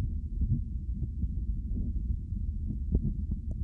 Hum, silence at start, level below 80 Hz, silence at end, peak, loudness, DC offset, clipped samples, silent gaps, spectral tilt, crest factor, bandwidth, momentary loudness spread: none; 0 s; -34 dBFS; 0 s; -12 dBFS; -35 LUFS; under 0.1%; under 0.1%; none; -12.5 dB/octave; 20 dB; 0.9 kHz; 4 LU